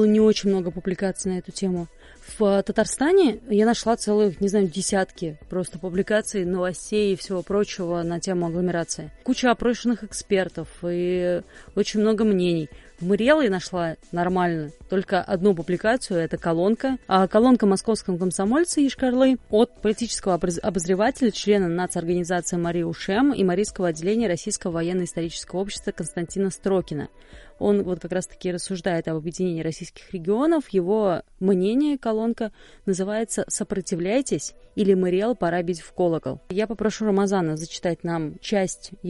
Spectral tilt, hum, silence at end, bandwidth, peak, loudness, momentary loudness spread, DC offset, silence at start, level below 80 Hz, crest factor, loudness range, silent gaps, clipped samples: -5.5 dB/octave; none; 0 s; 11.5 kHz; -4 dBFS; -23 LUFS; 9 LU; under 0.1%; 0 s; -48 dBFS; 18 dB; 5 LU; none; under 0.1%